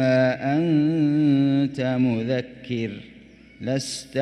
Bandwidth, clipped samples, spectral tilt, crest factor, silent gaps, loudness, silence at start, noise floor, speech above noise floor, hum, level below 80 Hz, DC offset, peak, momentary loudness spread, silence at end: 11.5 kHz; under 0.1%; -6.5 dB/octave; 14 dB; none; -23 LUFS; 0 s; -47 dBFS; 25 dB; none; -60 dBFS; under 0.1%; -8 dBFS; 11 LU; 0 s